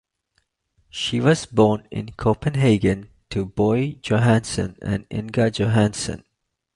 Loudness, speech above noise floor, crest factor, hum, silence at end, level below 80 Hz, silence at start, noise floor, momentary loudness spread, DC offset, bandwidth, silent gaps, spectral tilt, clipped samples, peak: -21 LUFS; 50 dB; 18 dB; none; 0.6 s; -44 dBFS; 0.95 s; -70 dBFS; 11 LU; under 0.1%; 11.5 kHz; none; -6 dB/octave; under 0.1%; -2 dBFS